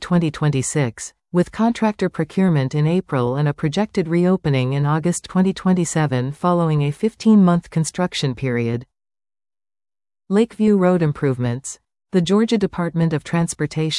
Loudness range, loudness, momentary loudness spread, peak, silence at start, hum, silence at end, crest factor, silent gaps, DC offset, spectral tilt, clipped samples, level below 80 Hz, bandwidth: 3 LU; -19 LUFS; 6 LU; -4 dBFS; 0 s; none; 0 s; 14 dB; none; under 0.1%; -6.5 dB/octave; under 0.1%; -50 dBFS; 12 kHz